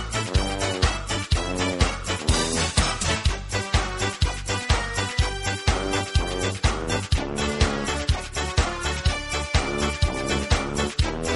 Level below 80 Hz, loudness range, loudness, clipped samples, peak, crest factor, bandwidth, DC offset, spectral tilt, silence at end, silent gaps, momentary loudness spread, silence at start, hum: -30 dBFS; 1 LU; -24 LUFS; under 0.1%; -6 dBFS; 18 dB; 11.5 kHz; under 0.1%; -4 dB/octave; 0 s; none; 4 LU; 0 s; none